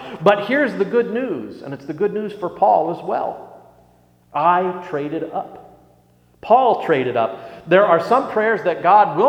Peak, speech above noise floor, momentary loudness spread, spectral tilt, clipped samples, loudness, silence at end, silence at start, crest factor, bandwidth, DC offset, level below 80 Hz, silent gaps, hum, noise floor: 0 dBFS; 37 dB; 15 LU; -7 dB/octave; under 0.1%; -18 LUFS; 0 s; 0 s; 18 dB; 10 kHz; under 0.1%; -62 dBFS; none; 60 Hz at -55 dBFS; -54 dBFS